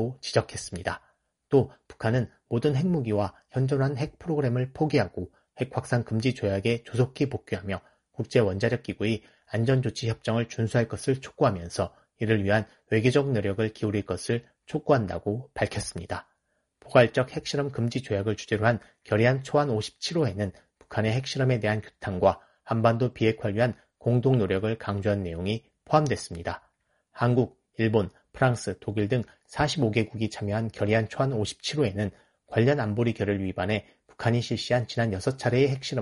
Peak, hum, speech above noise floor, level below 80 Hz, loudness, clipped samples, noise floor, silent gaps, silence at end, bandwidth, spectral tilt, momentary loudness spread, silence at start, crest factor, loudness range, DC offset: -4 dBFS; none; 49 dB; -56 dBFS; -27 LUFS; under 0.1%; -75 dBFS; none; 0 s; 11.5 kHz; -6.5 dB/octave; 9 LU; 0 s; 24 dB; 2 LU; under 0.1%